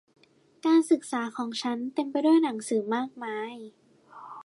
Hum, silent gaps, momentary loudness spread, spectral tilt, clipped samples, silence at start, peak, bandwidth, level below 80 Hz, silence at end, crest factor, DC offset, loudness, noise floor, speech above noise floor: none; none; 15 LU; -4 dB/octave; under 0.1%; 0.65 s; -12 dBFS; 11.5 kHz; -84 dBFS; 0.05 s; 16 dB; under 0.1%; -27 LUFS; -49 dBFS; 22 dB